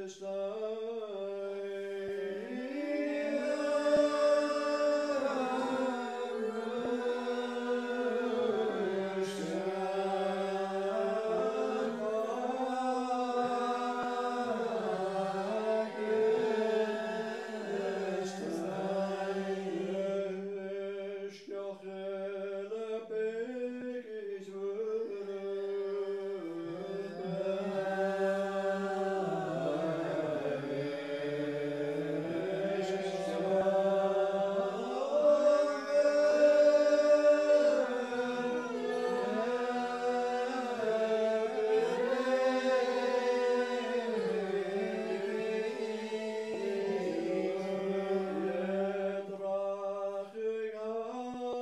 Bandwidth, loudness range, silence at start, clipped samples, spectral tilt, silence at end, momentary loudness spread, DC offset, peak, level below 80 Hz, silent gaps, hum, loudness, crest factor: 11.5 kHz; 10 LU; 0 s; under 0.1%; -5.5 dB/octave; 0 s; 10 LU; under 0.1%; -16 dBFS; -80 dBFS; none; none; -33 LUFS; 18 dB